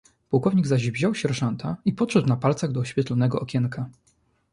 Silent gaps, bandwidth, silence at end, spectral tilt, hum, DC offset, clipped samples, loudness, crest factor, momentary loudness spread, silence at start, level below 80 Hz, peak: none; 11 kHz; 0.6 s; -7 dB/octave; none; under 0.1%; under 0.1%; -24 LUFS; 18 dB; 6 LU; 0.3 s; -58 dBFS; -6 dBFS